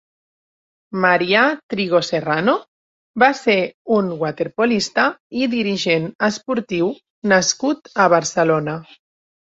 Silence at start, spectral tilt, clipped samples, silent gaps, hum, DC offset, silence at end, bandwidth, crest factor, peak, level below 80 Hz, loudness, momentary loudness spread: 0.9 s; -4 dB/octave; under 0.1%; 1.63-1.69 s, 2.68-3.14 s, 3.74-3.85 s, 5.20-5.30 s, 6.15-6.19 s, 7.10-7.22 s; none; under 0.1%; 0.7 s; 8 kHz; 18 dB; 0 dBFS; -60 dBFS; -18 LUFS; 8 LU